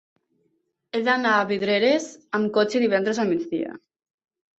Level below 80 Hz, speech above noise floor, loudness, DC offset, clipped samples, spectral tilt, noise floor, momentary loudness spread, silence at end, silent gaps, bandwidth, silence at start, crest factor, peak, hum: -70 dBFS; 49 dB; -23 LUFS; under 0.1%; under 0.1%; -4.5 dB/octave; -72 dBFS; 9 LU; 0.8 s; none; 8.2 kHz; 0.95 s; 18 dB; -6 dBFS; none